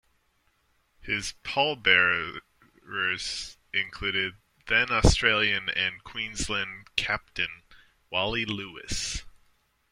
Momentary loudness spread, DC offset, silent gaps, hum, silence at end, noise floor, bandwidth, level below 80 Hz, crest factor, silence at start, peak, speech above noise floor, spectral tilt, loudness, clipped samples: 13 LU; under 0.1%; none; none; 0.6 s; -70 dBFS; 16 kHz; -40 dBFS; 26 dB; 1 s; -4 dBFS; 42 dB; -3 dB/octave; -27 LUFS; under 0.1%